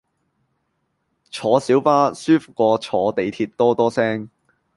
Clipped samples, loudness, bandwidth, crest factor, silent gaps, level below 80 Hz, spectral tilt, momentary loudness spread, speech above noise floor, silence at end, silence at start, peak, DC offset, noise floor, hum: under 0.1%; -19 LUFS; 11.5 kHz; 18 dB; none; -62 dBFS; -6 dB/octave; 8 LU; 53 dB; 0.5 s; 1.35 s; -2 dBFS; under 0.1%; -71 dBFS; none